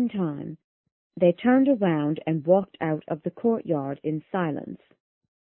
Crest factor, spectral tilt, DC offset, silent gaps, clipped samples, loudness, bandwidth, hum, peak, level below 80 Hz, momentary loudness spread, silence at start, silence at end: 18 dB; -12 dB/octave; under 0.1%; 0.64-0.84 s, 0.92-1.10 s; under 0.1%; -25 LUFS; 4 kHz; none; -6 dBFS; -68 dBFS; 14 LU; 0 s; 0.75 s